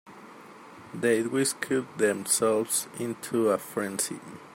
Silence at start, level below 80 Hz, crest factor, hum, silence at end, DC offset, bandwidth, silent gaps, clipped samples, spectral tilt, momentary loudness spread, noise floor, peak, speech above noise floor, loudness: 0.05 s; -74 dBFS; 18 dB; none; 0 s; under 0.1%; 16.5 kHz; none; under 0.1%; -3.5 dB/octave; 23 LU; -48 dBFS; -12 dBFS; 20 dB; -27 LUFS